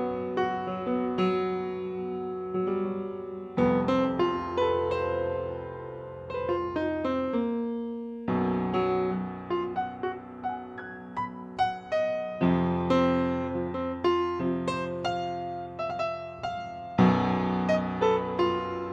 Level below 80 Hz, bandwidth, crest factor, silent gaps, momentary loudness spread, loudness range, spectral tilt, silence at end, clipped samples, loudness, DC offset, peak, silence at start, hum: -56 dBFS; 9 kHz; 20 dB; none; 10 LU; 4 LU; -7.5 dB/octave; 0 s; under 0.1%; -29 LUFS; under 0.1%; -8 dBFS; 0 s; none